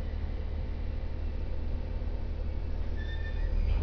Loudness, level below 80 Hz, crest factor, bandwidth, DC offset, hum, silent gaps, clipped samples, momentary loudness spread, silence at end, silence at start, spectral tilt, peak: -37 LUFS; -32 dBFS; 14 dB; 5.4 kHz; under 0.1%; none; none; under 0.1%; 3 LU; 0 s; 0 s; -8.5 dB/octave; -16 dBFS